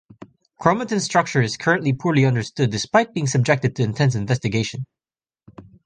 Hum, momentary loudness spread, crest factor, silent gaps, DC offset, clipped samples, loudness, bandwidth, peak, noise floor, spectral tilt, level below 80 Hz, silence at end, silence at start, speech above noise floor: none; 5 LU; 20 dB; none; under 0.1%; under 0.1%; -20 LUFS; 9.8 kHz; -2 dBFS; under -90 dBFS; -5.5 dB/octave; -54 dBFS; 0.25 s; 0.6 s; over 70 dB